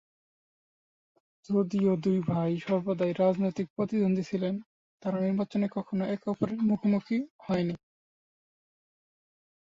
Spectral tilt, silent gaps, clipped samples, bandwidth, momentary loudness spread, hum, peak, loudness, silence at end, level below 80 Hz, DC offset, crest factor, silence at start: -8.5 dB/octave; 3.70-3.76 s, 4.66-4.98 s, 7.30-7.39 s; under 0.1%; 7.4 kHz; 7 LU; none; -12 dBFS; -29 LUFS; 1.85 s; -68 dBFS; under 0.1%; 18 dB; 1.5 s